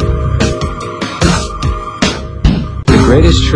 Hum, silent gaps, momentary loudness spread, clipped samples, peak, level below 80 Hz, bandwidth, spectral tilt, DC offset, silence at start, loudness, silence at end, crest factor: none; none; 10 LU; 0.8%; 0 dBFS; -16 dBFS; 11 kHz; -5.5 dB/octave; under 0.1%; 0 s; -13 LUFS; 0 s; 12 dB